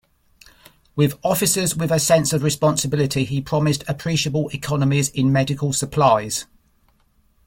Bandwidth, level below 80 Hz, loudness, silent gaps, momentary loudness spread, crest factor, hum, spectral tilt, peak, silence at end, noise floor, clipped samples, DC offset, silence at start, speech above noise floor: 17 kHz; -50 dBFS; -20 LUFS; none; 6 LU; 18 dB; none; -4.5 dB/octave; -2 dBFS; 1.05 s; -60 dBFS; under 0.1%; under 0.1%; 0.95 s; 41 dB